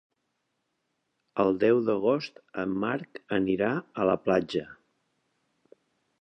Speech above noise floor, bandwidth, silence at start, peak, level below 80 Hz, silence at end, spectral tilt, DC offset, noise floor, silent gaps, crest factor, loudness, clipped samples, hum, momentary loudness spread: 52 dB; 8.6 kHz; 1.35 s; -10 dBFS; -64 dBFS; 1.45 s; -7.5 dB/octave; under 0.1%; -79 dBFS; none; 20 dB; -28 LUFS; under 0.1%; none; 11 LU